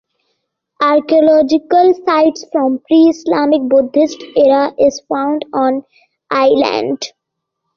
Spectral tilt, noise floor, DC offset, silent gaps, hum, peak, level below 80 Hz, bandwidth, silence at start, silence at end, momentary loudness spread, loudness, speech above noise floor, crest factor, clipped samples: -4.5 dB/octave; -76 dBFS; under 0.1%; none; none; -2 dBFS; -56 dBFS; 7.2 kHz; 0.8 s; 0.7 s; 7 LU; -13 LUFS; 64 dB; 12 dB; under 0.1%